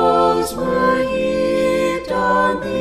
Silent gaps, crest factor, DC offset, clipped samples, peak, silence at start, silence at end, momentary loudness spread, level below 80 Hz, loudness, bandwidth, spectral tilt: none; 14 dB; under 0.1%; under 0.1%; -2 dBFS; 0 s; 0 s; 4 LU; -40 dBFS; -17 LUFS; 14.5 kHz; -5 dB/octave